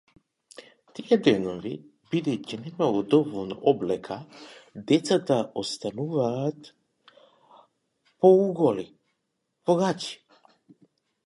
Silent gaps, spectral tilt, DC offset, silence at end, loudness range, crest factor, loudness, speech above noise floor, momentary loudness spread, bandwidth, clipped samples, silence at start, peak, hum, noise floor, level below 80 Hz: none; -6 dB/octave; under 0.1%; 1.1 s; 3 LU; 22 dB; -25 LUFS; 54 dB; 20 LU; 11.5 kHz; under 0.1%; 0.6 s; -6 dBFS; none; -78 dBFS; -68 dBFS